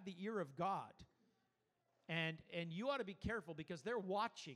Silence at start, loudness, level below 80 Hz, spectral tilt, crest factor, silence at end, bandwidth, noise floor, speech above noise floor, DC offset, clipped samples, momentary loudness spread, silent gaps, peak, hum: 0 s; -45 LUFS; -68 dBFS; -5.5 dB/octave; 18 dB; 0 s; 12.5 kHz; -85 dBFS; 40 dB; under 0.1%; under 0.1%; 6 LU; none; -28 dBFS; none